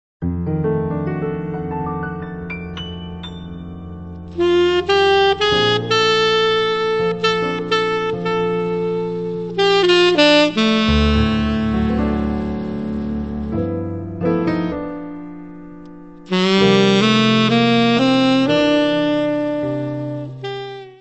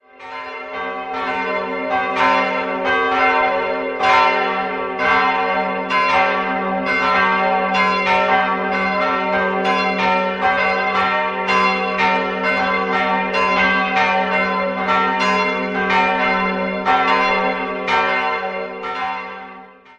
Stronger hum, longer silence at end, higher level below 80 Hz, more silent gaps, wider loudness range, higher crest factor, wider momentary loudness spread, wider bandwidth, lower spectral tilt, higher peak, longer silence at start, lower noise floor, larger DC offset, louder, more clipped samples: neither; about the same, 0.05 s vs 0.05 s; first, -34 dBFS vs -50 dBFS; neither; first, 9 LU vs 2 LU; about the same, 16 dB vs 18 dB; first, 17 LU vs 9 LU; second, 8.4 kHz vs 9.4 kHz; about the same, -5.5 dB/octave vs -5 dB/octave; about the same, 0 dBFS vs 0 dBFS; about the same, 0.2 s vs 0.2 s; about the same, -38 dBFS vs -40 dBFS; first, 0.4% vs under 0.1%; about the same, -17 LUFS vs -17 LUFS; neither